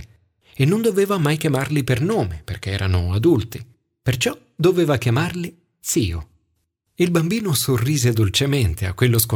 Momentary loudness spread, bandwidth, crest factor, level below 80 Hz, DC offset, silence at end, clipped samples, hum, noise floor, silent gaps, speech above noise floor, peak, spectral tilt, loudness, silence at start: 10 LU; 19 kHz; 16 dB; -40 dBFS; under 0.1%; 0 s; under 0.1%; none; -71 dBFS; none; 52 dB; -4 dBFS; -5.5 dB/octave; -20 LUFS; 0 s